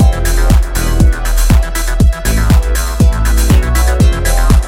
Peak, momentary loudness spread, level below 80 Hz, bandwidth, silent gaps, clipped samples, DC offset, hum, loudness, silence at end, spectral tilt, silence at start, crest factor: 0 dBFS; 4 LU; -10 dBFS; 16.5 kHz; none; under 0.1%; under 0.1%; none; -12 LUFS; 0 s; -5.5 dB/octave; 0 s; 8 dB